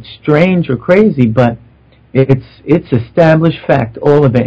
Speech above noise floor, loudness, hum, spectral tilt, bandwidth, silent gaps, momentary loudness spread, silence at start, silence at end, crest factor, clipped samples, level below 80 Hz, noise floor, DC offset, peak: 34 dB; -11 LUFS; none; -9.5 dB/octave; 8 kHz; none; 6 LU; 0 s; 0 s; 10 dB; 2%; -40 dBFS; -44 dBFS; under 0.1%; 0 dBFS